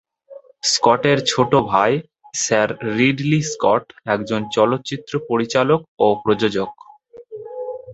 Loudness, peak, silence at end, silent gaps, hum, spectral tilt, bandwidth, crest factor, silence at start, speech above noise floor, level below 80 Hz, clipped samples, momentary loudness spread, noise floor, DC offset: -18 LUFS; -2 dBFS; 0 s; 5.88-5.97 s; none; -4.5 dB/octave; 8.2 kHz; 18 dB; 0.3 s; 25 dB; -56 dBFS; under 0.1%; 13 LU; -43 dBFS; under 0.1%